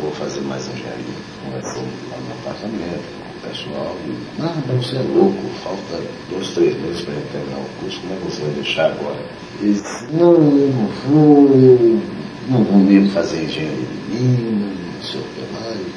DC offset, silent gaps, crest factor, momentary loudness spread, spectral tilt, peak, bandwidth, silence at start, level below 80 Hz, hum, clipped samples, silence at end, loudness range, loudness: under 0.1%; none; 16 dB; 17 LU; -7 dB/octave; 0 dBFS; 10.5 kHz; 0 s; -52 dBFS; none; under 0.1%; 0 s; 14 LU; -18 LUFS